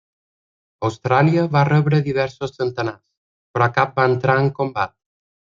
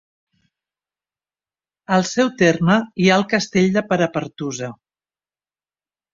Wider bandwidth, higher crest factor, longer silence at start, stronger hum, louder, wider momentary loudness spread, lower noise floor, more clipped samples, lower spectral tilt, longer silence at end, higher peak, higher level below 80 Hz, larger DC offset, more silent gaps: about the same, 7.4 kHz vs 7.6 kHz; about the same, 18 dB vs 20 dB; second, 0.8 s vs 1.9 s; second, none vs 50 Hz at -45 dBFS; about the same, -19 LUFS vs -18 LUFS; about the same, 10 LU vs 11 LU; about the same, under -90 dBFS vs under -90 dBFS; neither; first, -8 dB/octave vs -5.5 dB/octave; second, 0.75 s vs 1.4 s; about the same, -2 dBFS vs -2 dBFS; about the same, -58 dBFS vs -58 dBFS; neither; first, 3.17-3.54 s vs none